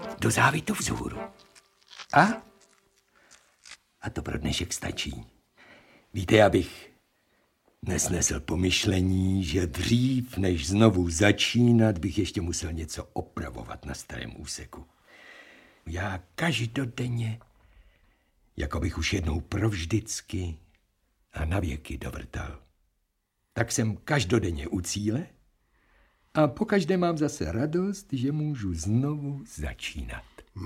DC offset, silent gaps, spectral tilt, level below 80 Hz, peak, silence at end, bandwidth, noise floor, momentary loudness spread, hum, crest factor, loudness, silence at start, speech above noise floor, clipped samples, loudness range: under 0.1%; none; -5 dB/octave; -44 dBFS; -4 dBFS; 0 s; 16.5 kHz; -76 dBFS; 17 LU; none; 24 dB; -27 LUFS; 0 s; 49 dB; under 0.1%; 11 LU